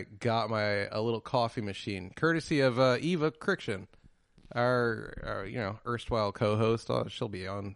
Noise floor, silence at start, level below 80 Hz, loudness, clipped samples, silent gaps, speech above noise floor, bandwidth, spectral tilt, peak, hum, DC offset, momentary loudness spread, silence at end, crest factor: -59 dBFS; 0 s; -56 dBFS; -31 LUFS; under 0.1%; none; 29 dB; 11.5 kHz; -6.5 dB/octave; -14 dBFS; none; under 0.1%; 11 LU; 0 s; 18 dB